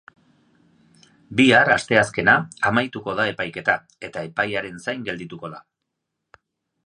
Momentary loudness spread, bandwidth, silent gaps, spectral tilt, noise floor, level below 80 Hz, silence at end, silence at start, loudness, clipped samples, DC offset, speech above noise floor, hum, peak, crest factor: 17 LU; 11 kHz; none; -4.5 dB/octave; -80 dBFS; -58 dBFS; 1.25 s; 1.3 s; -20 LUFS; under 0.1%; under 0.1%; 59 dB; none; 0 dBFS; 22 dB